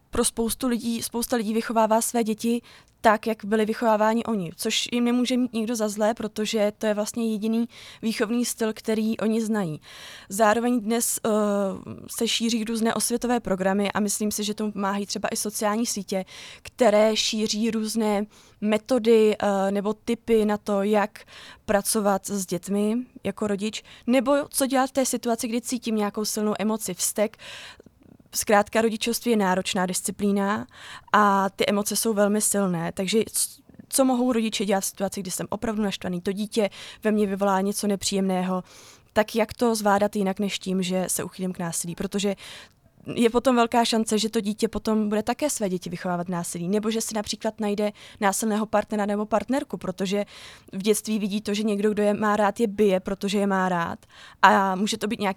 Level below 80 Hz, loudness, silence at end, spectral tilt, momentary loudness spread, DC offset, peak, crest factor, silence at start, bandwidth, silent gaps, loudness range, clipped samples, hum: -56 dBFS; -24 LUFS; 0 s; -4 dB/octave; 8 LU; under 0.1%; 0 dBFS; 24 dB; 0.15 s; 19 kHz; none; 3 LU; under 0.1%; none